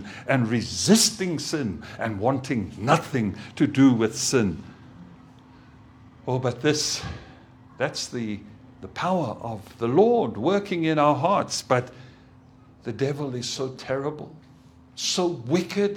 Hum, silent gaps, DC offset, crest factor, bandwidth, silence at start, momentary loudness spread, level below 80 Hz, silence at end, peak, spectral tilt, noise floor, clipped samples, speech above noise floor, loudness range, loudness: none; none; under 0.1%; 22 dB; 18.5 kHz; 0 s; 17 LU; -56 dBFS; 0 s; -4 dBFS; -4.5 dB/octave; -51 dBFS; under 0.1%; 27 dB; 6 LU; -24 LUFS